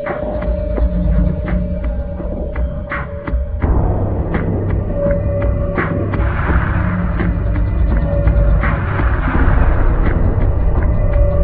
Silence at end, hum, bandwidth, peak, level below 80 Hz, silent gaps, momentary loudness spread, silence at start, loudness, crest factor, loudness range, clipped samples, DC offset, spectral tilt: 0 s; none; 4 kHz; 0 dBFS; -16 dBFS; none; 7 LU; 0 s; -18 LUFS; 14 dB; 4 LU; under 0.1%; under 0.1%; -12 dB/octave